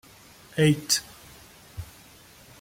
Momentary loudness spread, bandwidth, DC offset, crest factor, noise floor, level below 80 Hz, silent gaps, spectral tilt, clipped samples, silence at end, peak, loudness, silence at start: 24 LU; 16.5 kHz; under 0.1%; 20 dB; -51 dBFS; -54 dBFS; none; -4 dB/octave; under 0.1%; 0.75 s; -8 dBFS; -24 LUFS; 0.55 s